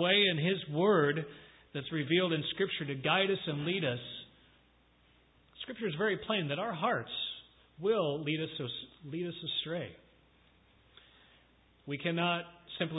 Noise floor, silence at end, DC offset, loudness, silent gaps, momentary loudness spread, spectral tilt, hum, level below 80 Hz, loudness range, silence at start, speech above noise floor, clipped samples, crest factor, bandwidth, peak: -67 dBFS; 0 s; under 0.1%; -33 LUFS; none; 16 LU; -9 dB/octave; none; -70 dBFS; 8 LU; 0 s; 34 dB; under 0.1%; 20 dB; 4 kHz; -14 dBFS